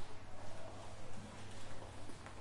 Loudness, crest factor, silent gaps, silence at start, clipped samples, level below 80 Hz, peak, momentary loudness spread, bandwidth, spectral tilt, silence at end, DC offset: -53 LUFS; 10 dB; none; 0 s; under 0.1%; -58 dBFS; -30 dBFS; 1 LU; 11.5 kHz; -4.5 dB/octave; 0 s; under 0.1%